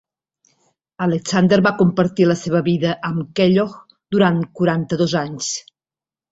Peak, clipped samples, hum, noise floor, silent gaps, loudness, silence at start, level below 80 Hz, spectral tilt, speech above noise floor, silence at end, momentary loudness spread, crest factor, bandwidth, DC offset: -2 dBFS; under 0.1%; none; under -90 dBFS; none; -18 LUFS; 1 s; -56 dBFS; -6 dB/octave; over 73 dB; 0.7 s; 9 LU; 18 dB; 8 kHz; under 0.1%